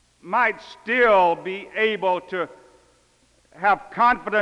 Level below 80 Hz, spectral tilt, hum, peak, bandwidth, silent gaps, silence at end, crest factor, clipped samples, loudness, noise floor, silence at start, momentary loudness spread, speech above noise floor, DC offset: -58 dBFS; -5 dB/octave; none; -6 dBFS; 10.5 kHz; none; 0 s; 16 dB; under 0.1%; -21 LUFS; -60 dBFS; 0.25 s; 13 LU; 39 dB; under 0.1%